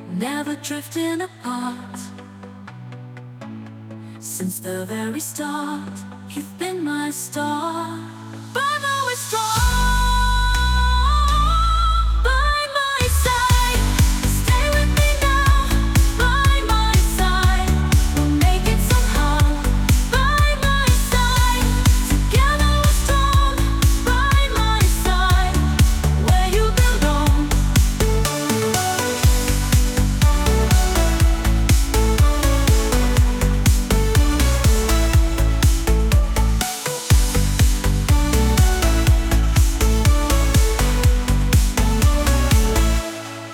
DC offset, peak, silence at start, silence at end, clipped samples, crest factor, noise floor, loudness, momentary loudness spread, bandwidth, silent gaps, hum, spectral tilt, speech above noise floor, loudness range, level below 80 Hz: under 0.1%; -4 dBFS; 0 s; 0 s; under 0.1%; 14 dB; -38 dBFS; -18 LUFS; 11 LU; 18 kHz; none; none; -4.5 dB/octave; 13 dB; 9 LU; -20 dBFS